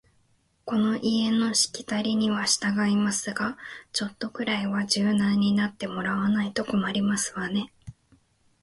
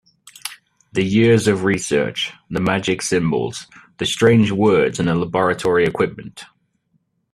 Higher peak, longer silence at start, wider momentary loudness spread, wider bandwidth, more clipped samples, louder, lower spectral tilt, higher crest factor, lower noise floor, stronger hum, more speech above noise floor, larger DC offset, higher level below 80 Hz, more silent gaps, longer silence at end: second, -8 dBFS vs 0 dBFS; first, 0.65 s vs 0.45 s; second, 8 LU vs 18 LU; second, 11.5 kHz vs 14 kHz; neither; second, -25 LUFS vs -18 LUFS; second, -4 dB/octave vs -5.5 dB/octave; about the same, 20 dB vs 18 dB; about the same, -66 dBFS vs -66 dBFS; neither; second, 41 dB vs 48 dB; neither; second, -62 dBFS vs -52 dBFS; neither; second, 0.7 s vs 0.9 s